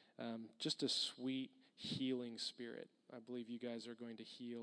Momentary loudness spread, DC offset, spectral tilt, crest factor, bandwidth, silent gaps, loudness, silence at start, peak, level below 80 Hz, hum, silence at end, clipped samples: 13 LU; under 0.1%; -4 dB/octave; 18 dB; 10.5 kHz; none; -45 LUFS; 0 s; -28 dBFS; under -90 dBFS; none; 0 s; under 0.1%